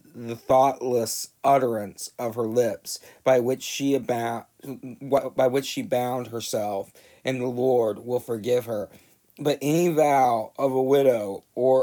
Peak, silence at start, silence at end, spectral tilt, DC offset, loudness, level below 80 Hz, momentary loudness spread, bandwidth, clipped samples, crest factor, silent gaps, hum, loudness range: -6 dBFS; 0.15 s; 0 s; -5 dB/octave; under 0.1%; -24 LUFS; -68 dBFS; 13 LU; 19.5 kHz; under 0.1%; 18 dB; none; none; 4 LU